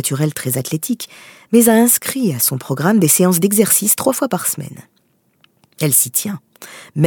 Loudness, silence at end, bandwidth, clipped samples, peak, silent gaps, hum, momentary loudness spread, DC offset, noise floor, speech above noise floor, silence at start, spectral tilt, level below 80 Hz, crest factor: -14 LUFS; 0 s; 19.5 kHz; under 0.1%; 0 dBFS; none; none; 15 LU; under 0.1%; -60 dBFS; 44 dB; 0 s; -4.5 dB/octave; -62 dBFS; 16 dB